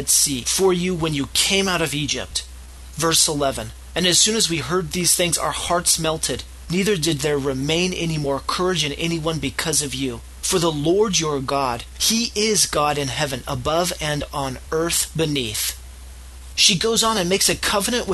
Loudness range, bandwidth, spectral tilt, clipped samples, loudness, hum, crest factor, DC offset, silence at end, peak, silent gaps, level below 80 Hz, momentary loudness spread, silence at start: 3 LU; 13 kHz; -2.5 dB/octave; under 0.1%; -19 LUFS; none; 20 dB; under 0.1%; 0 s; -2 dBFS; none; -40 dBFS; 9 LU; 0 s